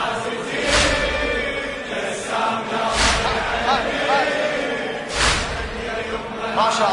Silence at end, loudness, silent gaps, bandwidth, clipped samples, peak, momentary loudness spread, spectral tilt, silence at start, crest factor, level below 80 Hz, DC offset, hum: 0 s; -20 LUFS; none; 11 kHz; under 0.1%; -4 dBFS; 9 LU; -2.5 dB/octave; 0 s; 18 dB; -34 dBFS; under 0.1%; none